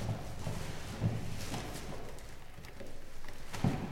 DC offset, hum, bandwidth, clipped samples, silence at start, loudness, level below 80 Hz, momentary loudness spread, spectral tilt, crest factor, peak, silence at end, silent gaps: under 0.1%; none; 16.5 kHz; under 0.1%; 0 s; -41 LUFS; -46 dBFS; 15 LU; -5.5 dB/octave; 22 dB; -16 dBFS; 0 s; none